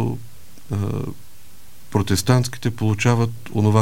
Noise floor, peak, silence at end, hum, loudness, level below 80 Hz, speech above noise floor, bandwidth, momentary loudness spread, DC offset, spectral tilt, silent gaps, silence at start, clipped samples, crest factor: -49 dBFS; -2 dBFS; 0 s; none; -21 LUFS; -48 dBFS; 29 dB; 16.5 kHz; 11 LU; 2%; -6 dB/octave; none; 0 s; under 0.1%; 18 dB